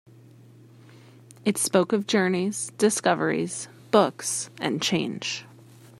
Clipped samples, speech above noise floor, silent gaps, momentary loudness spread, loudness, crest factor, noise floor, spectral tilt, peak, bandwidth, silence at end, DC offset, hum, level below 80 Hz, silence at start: under 0.1%; 26 dB; none; 9 LU; -25 LUFS; 22 dB; -51 dBFS; -4 dB/octave; -4 dBFS; 14.5 kHz; 0.55 s; under 0.1%; none; -72 dBFS; 1.45 s